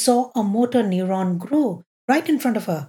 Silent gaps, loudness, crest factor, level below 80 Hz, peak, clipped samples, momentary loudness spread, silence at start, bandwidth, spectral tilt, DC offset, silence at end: 1.86-2.08 s; -21 LUFS; 16 dB; -80 dBFS; -4 dBFS; under 0.1%; 4 LU; 0 s; 18 kHz; -5.5 dB/octave; under 0.1%; 0.05 s